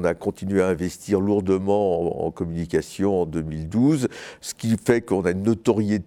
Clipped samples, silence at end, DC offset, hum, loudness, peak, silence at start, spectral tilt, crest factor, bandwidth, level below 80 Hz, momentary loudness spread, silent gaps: under 0.1%; 0.05 s; under 0.1%; none; -23 LUFS; -4 dBFS; 0 s; -7 dB/octave; 18 dB; 16 kHz; -48 dBFS; 7 LU; none